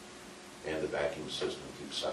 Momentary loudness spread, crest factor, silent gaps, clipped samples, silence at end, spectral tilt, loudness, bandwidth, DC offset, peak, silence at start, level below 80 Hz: 14 LU; 18 dB; none; under 0.1%; 0 s; -3.5 dB/octave; -37 LUFS; 12.5 kHz; under 0.1%; -20 dBFS; 0 s; -62 dBFS